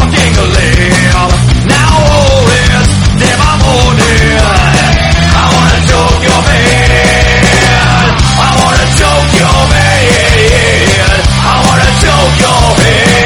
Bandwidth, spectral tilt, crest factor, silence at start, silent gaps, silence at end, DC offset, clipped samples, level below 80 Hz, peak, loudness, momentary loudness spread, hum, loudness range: 16 kHz; -4.5 dB/octave; 6 dB; 0 s; none; 0 s; under 0.1%; 3%; -14 dBFS; 0 dBFS; -6 LUFS; 2 LU; none; 1 LU